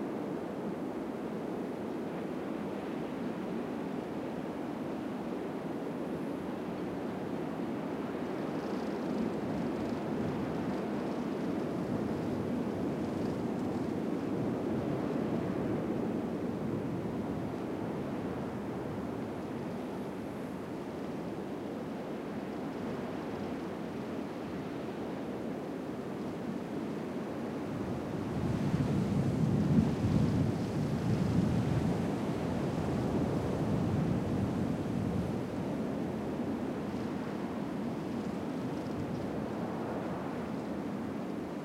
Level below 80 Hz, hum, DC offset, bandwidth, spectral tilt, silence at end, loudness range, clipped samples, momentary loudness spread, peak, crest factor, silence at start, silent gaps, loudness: -56 dBFS; none; under 0.1%; 16 kHz; -8 dB/octave; 0 s; 7 LU; under 0.1%; 8 LU; -14 dBFS; 20 dB; 0 s; none; -36 LUFS